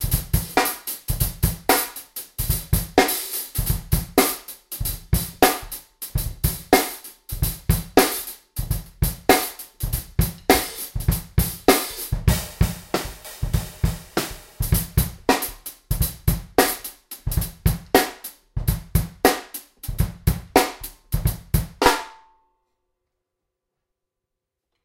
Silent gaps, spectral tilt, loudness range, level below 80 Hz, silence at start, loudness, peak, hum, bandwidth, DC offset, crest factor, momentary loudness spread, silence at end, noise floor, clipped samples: none; -4 dB/octave; 3 LU; -30 dBFS; 0 s; -23 LUFS; 0 dBFS; none; 17 kHz; under 0.1%; 24 dB; 13 LU; 2.7 s; -83 dBFS; under 0.1%